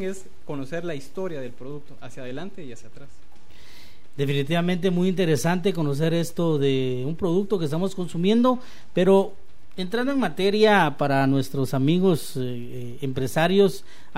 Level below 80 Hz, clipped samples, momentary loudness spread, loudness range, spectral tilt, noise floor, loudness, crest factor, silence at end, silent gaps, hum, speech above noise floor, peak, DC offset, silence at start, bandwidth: -58 dBFS; under 0.1%; 17 LU; 13 LU; -6.5 dB/octave; -51 dBFS; -23 LUFS; 18 dB; 0.4 s; none; none; 28 dB; -6 dBFS; 3%; 0 s; 16 kHz